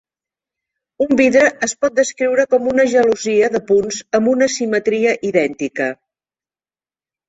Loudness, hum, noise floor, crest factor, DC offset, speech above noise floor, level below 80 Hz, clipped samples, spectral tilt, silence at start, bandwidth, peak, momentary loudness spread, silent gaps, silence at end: -16 LUFS; none; under -90 dBFS; 16 dB; under 0.1%; over 75 dB; -58 dBFS; under 0.1%; -4 dB/octave; 1 s; 8.2 kHz; -2 dBFS; 8 LU; none; 1.35 s